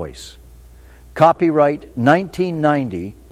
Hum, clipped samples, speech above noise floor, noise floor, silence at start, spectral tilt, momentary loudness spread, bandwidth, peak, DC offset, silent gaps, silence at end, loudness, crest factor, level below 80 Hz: none; under 0.1%; 26 dB; -43 dBFS; 0 s; -7 dB/octave; 19 LU; 15 kHz; 0 dBFS; under 0.1%; none; 0.2 s; -16 LUFS; 18 dB; -46 dBFS